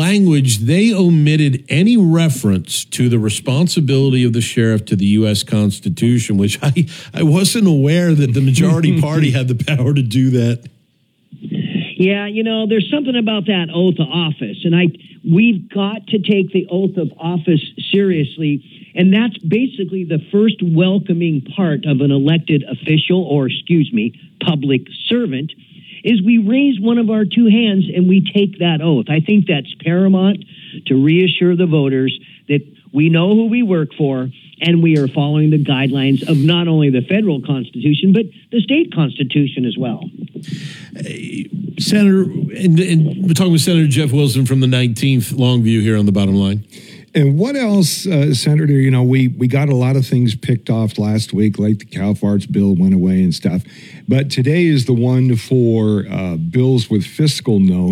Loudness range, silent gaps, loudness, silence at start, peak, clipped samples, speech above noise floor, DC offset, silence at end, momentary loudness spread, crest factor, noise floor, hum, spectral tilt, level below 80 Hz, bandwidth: 3 LU; none; -15 LUFS; 0 s; 0 dBFS; under 0.1%; 45 dB; under 0.1%; 0 s; 8 LU; 14 dB; -58 dBFS; none; -6.5 dB/octave; -62 dBFS; 15.5 kHz